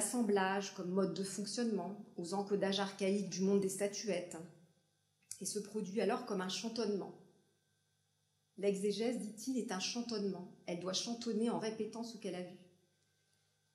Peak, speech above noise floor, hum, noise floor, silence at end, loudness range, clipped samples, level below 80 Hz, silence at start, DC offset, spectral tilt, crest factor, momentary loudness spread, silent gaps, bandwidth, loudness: -20 dBFS; 42 dB; none; -80 dBFS; 1.1 s; 4 LU; under 0.1%; under -90 dBFS; 0 s; under 0.1%; -4.5 dB/octave; 20 dB; 11 LU; none; 15 kHz; -39 LUFS